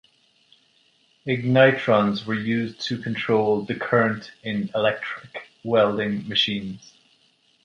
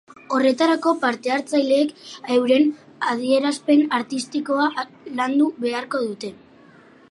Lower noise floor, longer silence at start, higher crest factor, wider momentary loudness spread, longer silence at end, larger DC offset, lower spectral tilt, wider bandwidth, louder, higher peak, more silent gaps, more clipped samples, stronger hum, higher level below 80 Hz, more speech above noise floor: first, -62 dBFS vs -49 dBFS; first, 1.25 s vs 0.3 s; first, 22 dB vs 16 dB; first, 16 LU vs 9 LU; about the same, 0.85 s vs 0.8 s; neither; first, -6.5 dB/octave vs -4 dB/octave; second, 10 kHz vs 11.5 kHz; about the same, -22 LUFS vs -21 LUFS; first, -2 dBFS vs -6 dBFS; neither; neither; neither; first, -62 dBFS vs -74 dBFS; first, 40 dB vs 29 dB